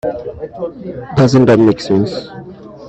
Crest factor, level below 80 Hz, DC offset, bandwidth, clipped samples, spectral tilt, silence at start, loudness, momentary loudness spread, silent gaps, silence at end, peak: 14 dB; -44 dBFS; under 0.1%; 8.4 kHz; under 0.1%; -7.5 dB/octave; 0.05 s; -12 LUFS; 21 LU; none; 0 s; 0 dBFS